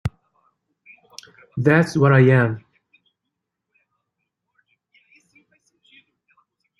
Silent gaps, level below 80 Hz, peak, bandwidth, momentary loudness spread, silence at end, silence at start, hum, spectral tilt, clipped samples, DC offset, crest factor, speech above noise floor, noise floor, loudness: none; -54 dBFS; -2 dBFS; 11.5 kHz; 28 LU; 4.2 s; 0.05 s; none; -8 dB/octave; under 0.1%; under 0.1%; 22 dB; 65 dB; -81 dBFS; -17 LUFS